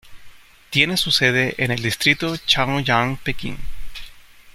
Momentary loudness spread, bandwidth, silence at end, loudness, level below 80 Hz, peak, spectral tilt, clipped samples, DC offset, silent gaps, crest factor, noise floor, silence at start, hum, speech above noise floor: 21 LU; 16.5 kHz; 0.05 s; -18 LUFS; -40 dBFS; -2 dBFS; -3.5 dB/octave; under 0.1%; under 0.1%; none; 20 dB; -42 dBFS; 0.05 s; none; 22 dB